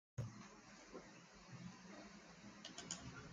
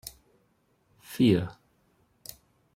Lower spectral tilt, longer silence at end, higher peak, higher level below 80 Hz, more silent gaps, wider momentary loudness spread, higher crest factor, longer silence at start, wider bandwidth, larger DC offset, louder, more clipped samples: second, -4 dB/octave vs -6.5 dB/octave; second, 0 s vs 1.25 s; second, -30 dBFS vs -10 dBFS; second, -74 dBFS vs -62 dBFS; neither; second, 9 LU vs 22 LU; about the same, 26 dB vs 22 dB; about the same, 0.15 s vs 0.05 s; second, 9.8 kHz vs 16.5 kHz; neither; second, -55 LUFS vs -26 LUFS; neither